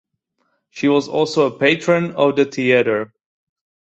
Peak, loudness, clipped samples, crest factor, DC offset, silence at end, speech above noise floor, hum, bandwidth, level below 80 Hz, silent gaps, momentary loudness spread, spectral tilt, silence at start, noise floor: -2 dBFS; -17 LUFS; under 0.1%; 18 dB; under 0.1%; 0.75 s; 52 dB; none; 8.2 kHz; -62 dBFS; none; 6 LU; -5.5 dB/octave; 0.75 s; -69 dBFS